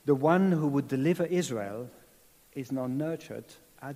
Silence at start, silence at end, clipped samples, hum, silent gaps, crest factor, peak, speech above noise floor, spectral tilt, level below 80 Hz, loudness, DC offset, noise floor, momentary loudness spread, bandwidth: 0.05 s; 0 s; under 0.1%; none; none; 18 dB; -10 dBFS; 32 dB; -7 dB/octave; -72 dBFS; -29 LUFS; under 0.1%; -60 dBFS; 19 LU; 15.5 kHz